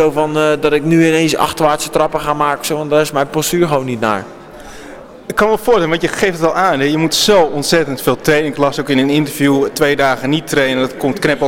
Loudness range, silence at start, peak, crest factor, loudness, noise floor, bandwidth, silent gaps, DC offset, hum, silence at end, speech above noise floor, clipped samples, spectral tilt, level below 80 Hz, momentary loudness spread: 3 LU; 0 s; 0 dBFS; 14 dB; -14 LUFS; -33 dBFS; 17 kHz; none; under 0.1%; none; 0 s; 20 dB; under 0.1%; -4.5 dB/octave; -42 dBFS; 6 LU